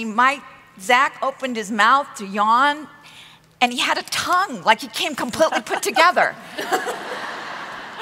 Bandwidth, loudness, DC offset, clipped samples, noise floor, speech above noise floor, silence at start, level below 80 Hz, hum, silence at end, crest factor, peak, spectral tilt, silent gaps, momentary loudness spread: 16 kHz; -19 LUFS; under 0.1%; under 0.1%; -46 dBFS; 26 dB; 0 s; -64 dBFS; none; 0 s; 20 dB; -2 dBFS; -2 dB/octave; none; 14 LU